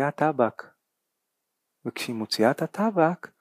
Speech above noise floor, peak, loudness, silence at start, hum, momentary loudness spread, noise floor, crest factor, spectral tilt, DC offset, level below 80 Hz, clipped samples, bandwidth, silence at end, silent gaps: 56 dB; -6 dBFS; -25 LUFS; 0 s; none; 13 LU; -81 dBFS; 20 dB; -5.5 dB/octave; under 0.1%; -80 dBFS; under 0.1%; 15.5 kHz; 0.15 s; none